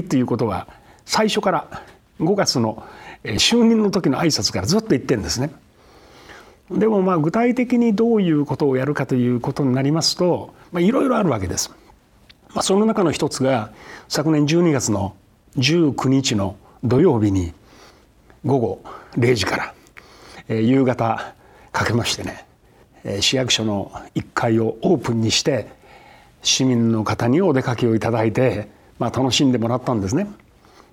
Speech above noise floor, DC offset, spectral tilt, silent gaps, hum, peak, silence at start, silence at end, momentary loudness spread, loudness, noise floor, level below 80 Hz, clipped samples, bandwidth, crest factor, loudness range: 33 dB; under 0.1%; -5 dB/octave; none; none; -4 dBFS; 0 s; 0.55 s; 12 LU; -19 LUFS; -52 dBFS; -50 dBFS; under 0.1%; 17 kHz; 16 dB; 3 LU